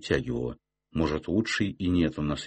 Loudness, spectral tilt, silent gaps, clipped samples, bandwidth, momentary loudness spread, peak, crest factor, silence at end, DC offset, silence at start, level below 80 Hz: -29 LUFS; -6 dB/octave; none; under 0.1%; 8.8 kHz; 10 LU; -12 dBFS; 16 dB; 0 s; under 0.1%; 0 s; -44 dBFS